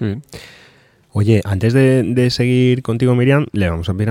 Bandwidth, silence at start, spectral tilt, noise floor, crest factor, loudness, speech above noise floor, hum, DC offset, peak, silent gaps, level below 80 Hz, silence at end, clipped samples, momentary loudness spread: 12.5 kHz; 0 s; -7.5 dB/octave; -50 dBFS; 14 dB; -15 LUFS; 35 dB; none; under 0.1%; -2 dBFS; none; -40 dBFS; 0 s; under 0.1%; 12 LU